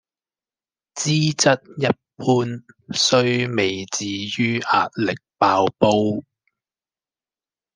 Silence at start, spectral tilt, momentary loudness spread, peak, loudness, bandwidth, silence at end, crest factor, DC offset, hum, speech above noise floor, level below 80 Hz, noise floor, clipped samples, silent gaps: 0.95 s; -4 dB/octave; 9 LU; -2 dBFS; -20 LUFS; 10.5 kHz; 1.55 s; 20 dB; under 0.1%; none; over 70 dB; -62 dBFS; under -90 dBFS; under 0.1%; none